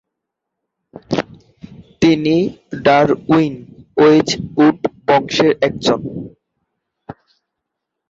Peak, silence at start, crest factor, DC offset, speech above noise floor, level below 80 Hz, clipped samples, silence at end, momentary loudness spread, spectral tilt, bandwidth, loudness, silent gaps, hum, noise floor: 0 dBFS; 1.1 s; 16 dB; under 0.1%; 65 dB; -50 dBFS; under 0.1%; 0.95 s; 13 LU; -5.5 dB/octave; 7.8 kHz; -15 LUFS; none; none; -79 dBFS